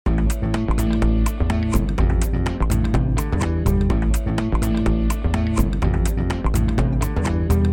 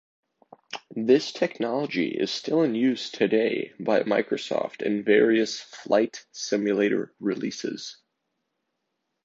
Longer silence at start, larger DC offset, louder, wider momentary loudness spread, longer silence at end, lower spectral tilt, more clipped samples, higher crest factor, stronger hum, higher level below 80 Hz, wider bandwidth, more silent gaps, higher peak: second, 0.05 s vs 0.7 s; neither; first, -21 LUFS vs -25 LUFS; second, 2 LU vs 11 LU; second, 0 s vs 1.3 s; first, -7 dB/octave vs -4.5 dB/octave; neither; about the same, 14 dB vs 18 dB; neither; first, -22 dBFS vs -74 dBFS; first, 17.5 kHz vs 7.8 kHz; neither; about the same, -4 dBFS vs -6 dBFS